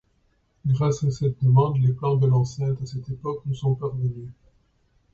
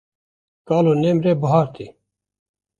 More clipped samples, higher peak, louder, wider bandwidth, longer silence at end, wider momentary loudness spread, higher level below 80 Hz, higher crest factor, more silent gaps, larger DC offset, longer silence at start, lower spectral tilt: neither; second, -6 dBFS vs -2 dBFS; second, -24 LUFS vs -18 LUFS; about the same, 7.4 kHz vs 7.4 kHz; about the same, 0.8 s vs 0.9 s; second, 12 LU vs 17 LU; first, -52 dBFS vs -58 dBFS; about the same, 16 dB vs 18 dB; neither; neither; about the same, 0.65 s vs 0.65 s; about the same, -8.5 dB/octave vs -9 dB/octave